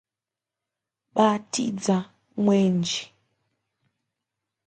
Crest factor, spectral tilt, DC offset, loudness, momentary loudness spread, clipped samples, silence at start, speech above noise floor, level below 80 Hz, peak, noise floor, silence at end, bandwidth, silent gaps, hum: 20 dB; -5.5 dB/octave; under 0.1%; -24 LUFS; 9 LU; under 0.1%; 1.15 s; 67 dB; -72 dBFS; -6 dBFS; -89 dBFS; 1.6 s; 9.4 kHz; none; none